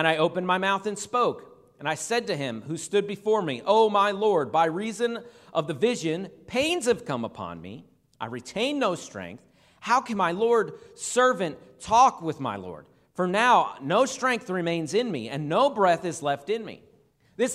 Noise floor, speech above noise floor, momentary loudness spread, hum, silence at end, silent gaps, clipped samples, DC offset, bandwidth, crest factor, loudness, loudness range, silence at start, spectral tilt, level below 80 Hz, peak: -61 dBFS; 36 dB; 16 LU; none; 0 s; none; under 0.1%; under 0.1%; 14 kHz; 20 dB; -25 LUFS; 5 LU; 0 s; -4 dB/octave; -66 dBFS; -6 dBFS